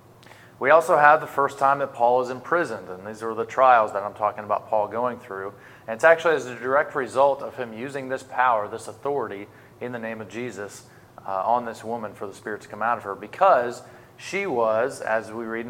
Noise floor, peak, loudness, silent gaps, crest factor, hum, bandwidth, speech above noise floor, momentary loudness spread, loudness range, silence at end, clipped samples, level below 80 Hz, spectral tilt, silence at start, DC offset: -49 dBFS; -2 dBFS; -23 LUFS; none; 22 dB; none; 16 kHz; 25 dB; 17 LU; 9 LU; 0 s; under 0.1%; -70 dBFS; -5 dB/octave; 0.6 s; under 0.1%